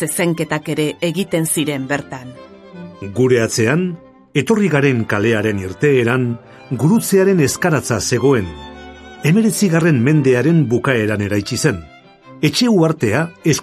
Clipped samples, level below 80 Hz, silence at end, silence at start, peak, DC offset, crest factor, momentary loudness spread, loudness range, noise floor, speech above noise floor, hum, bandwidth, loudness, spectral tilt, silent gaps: under 0.1%; -46 dBFS; 0 s; 0 s; 0 dBFS; under 0.1%; 16 dB; 15 LU; 4 LU; -41 dBFS; 26 dB; none; 14.5 kHz; -16 LUFS; -5.5 dB/octave; none